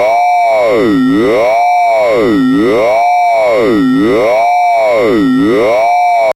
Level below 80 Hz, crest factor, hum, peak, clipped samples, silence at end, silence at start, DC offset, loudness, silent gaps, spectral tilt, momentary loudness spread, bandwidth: -40 dBFS; 6 dB; none; -4 dBFS; under 0.1%; 0.05 s; 0 s; under 0.1%; -9 LUFS; none; -6 dB/octave; 0 LU; 16 kHz